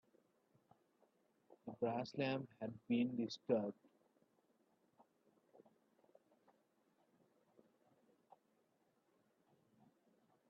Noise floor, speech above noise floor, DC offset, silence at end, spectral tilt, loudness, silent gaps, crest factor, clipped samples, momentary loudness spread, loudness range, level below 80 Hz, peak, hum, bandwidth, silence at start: -81 dBFS; 39 dB; under 0.1%; 6.75 s; -5.5 dB/octave; -43 LUFS; none; 26 dB; under 0.1%; 11 LU; 5 LU; -90 dBFS; -24 dBFS; none; 5.4 kHz; 1.5 s